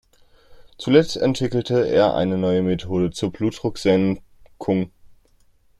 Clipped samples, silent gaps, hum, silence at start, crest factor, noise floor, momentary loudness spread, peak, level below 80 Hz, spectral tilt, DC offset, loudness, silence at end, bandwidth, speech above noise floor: under 0.1%; none; none; 0.5 s; 20 dB; -57 dBFS; 7 LU; -2 dBFS; -50 dBFS; -6.5 dB/octave; under 0.1%; -21 LUFS; 0.75 s; 12.5 kHz; 37 dB